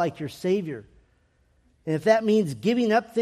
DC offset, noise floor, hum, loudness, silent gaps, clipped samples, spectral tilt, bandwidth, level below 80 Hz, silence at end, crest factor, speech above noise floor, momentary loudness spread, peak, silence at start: under 0.1%; -64 dBFS; none; -24 LUFS; none; under 0.1%; -6.5 dB/octave; 14 kHz; -64 dBFS; 0 s; 18 dB; 41 dB; 15 LU; -8 dBFS; 0 s